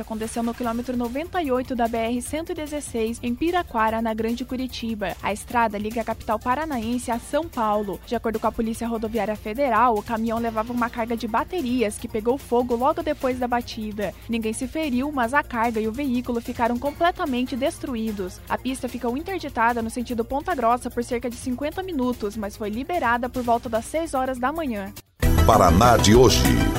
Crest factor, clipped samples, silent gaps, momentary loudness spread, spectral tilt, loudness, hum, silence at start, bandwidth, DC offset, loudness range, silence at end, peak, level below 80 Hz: 20 dB; under 0.1%; none; 9 LU; -5 dB/octave; -24 LUFS; none; 0 s; 16 kHz; under 0.1%; 3 LU; 0 s; -4 dBFS; -36 dBFS